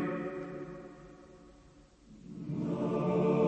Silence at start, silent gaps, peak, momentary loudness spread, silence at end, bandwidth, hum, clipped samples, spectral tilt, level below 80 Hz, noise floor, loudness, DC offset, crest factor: 0 s; none; -18 dBFS; 24 LU; 0 s; 8.6 kHz; none; under 0.1%; -9 dB/octave; -62 dBFS; -59 dBFS; -35 LUFS; under 0.1%; 18 dB